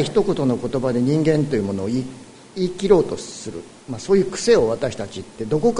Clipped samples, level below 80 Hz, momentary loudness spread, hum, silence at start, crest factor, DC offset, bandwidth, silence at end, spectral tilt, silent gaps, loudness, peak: under 0.1%; -46 dBFS; 16 LU; none; 0 s; 18 dB; under 0.1%; 11 kHz; 0 s; -6 dB/octave; none; -20 LUFS; -2 dBFS